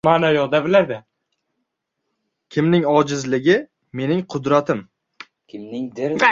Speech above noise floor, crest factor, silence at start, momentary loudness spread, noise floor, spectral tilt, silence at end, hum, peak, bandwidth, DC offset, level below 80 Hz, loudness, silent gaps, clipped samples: 59 dB; 20 dB; 0.05 s; 15 LU; -77 dBFS; -6 dB/octave; 0 s; none; 0 dBFS; 7.8 kHz; under 0.1%; -60 dBFS; -19 LUFS; none; under 0.1%